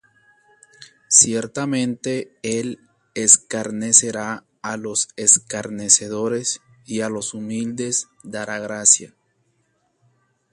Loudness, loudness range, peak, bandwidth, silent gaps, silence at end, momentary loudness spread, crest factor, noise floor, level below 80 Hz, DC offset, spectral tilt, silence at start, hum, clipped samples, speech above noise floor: -18 LUFS; 5 LU; 0 dBFS; 14 kHz; none; 1.45 s; 17 LU; 22 dB; -67 dBFS; -64 dBFS; under 0.1%; -2 dB/octave; 0.8 s; none; under 0.1%; 46 dB